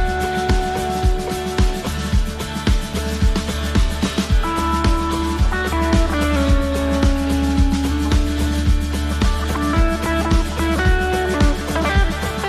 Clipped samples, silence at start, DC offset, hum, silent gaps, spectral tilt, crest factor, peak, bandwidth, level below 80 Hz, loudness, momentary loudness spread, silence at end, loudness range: under 0.1%; 0 s; under 0.1%; none; none; -5.5 dB/octave; 14 dB; -4 dBFS; 13.5 kHz; -20 dBFS; -19 LUFS; 4 LU; 0 s; 3 LU